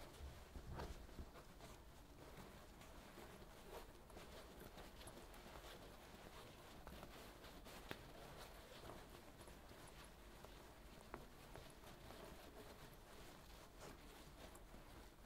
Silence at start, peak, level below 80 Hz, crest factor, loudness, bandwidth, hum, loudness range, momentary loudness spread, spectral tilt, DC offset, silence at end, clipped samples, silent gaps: 0 s; -28 dBFS; -64 dBFS; 32 dB; -60 LUFS; 16 kHz; none; 2 LU; 5 LU; -4 dB/octave; under 0.1%; 0 s; under 0.1%; none